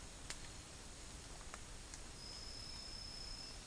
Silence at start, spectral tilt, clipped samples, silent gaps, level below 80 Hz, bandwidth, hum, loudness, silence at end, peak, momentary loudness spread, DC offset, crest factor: 0 s; -2 dB/octave; under 0.1%; none; -56 dBFS; 10.5 kHz; none; -51 LUFS; 0 s; -24 dBFS; 5 LU; under 0.1%; 28 dB